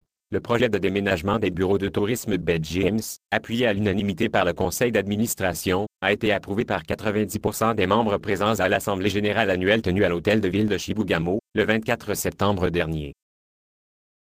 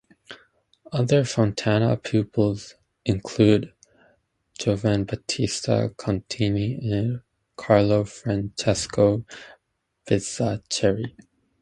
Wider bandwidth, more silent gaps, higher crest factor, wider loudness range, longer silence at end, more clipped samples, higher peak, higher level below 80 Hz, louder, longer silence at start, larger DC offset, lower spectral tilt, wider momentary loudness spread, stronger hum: first, 15.5 kHz vs 11 kHz; neither; about the same, 20 dB vs 22 dB; about the same, 2 LU vs 3 LU; first, 1.1 s vs 0.5 s; neither; about the same, -4 dBFS vs -2 dBFS; about the same, -46 dBFS vs -48 dBFS; about the same, -23 LUFS vs -23 LUFS; about the same, 0.3 s vs 0.3 s; neither; about the same, -5 dB/octave vs -6 dB/octave; second, 5 LU vs 15 LU; neither